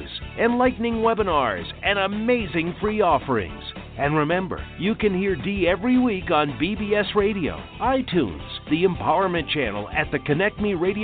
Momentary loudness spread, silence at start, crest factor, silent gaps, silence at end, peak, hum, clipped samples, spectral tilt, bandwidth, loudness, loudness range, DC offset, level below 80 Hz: 6 LU; 0 s; 16 dB; none; 0 s; -8 dBFS; none; under 0.1%; -10.5 dB/octave; 4.6 kHz; -23 LUFS; 1 LU; under 0.1%; -42 dBFS